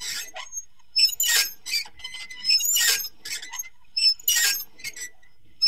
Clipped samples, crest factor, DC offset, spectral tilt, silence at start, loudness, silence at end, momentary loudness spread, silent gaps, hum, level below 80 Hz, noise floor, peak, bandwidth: under 0.1%; 20 dB; 0.7%; 4 dB/octave; 0 s; -21 LUFS; 0 s; 17 LU; none; none; -64 dBFS; -60 dBFS; -6 dBFS; 16 kHz